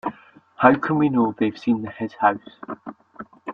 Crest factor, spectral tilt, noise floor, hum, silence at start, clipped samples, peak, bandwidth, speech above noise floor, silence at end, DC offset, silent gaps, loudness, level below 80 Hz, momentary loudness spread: 22 dB; -8.5 dB/octave; -48 dBFS; none; 0.05 s; under 0.1%; -2 dBFS; 6.6 kHz; 27 dB; 0 s; under 0.1%; none; -21 LUFS; -62 dBFS; 20 LU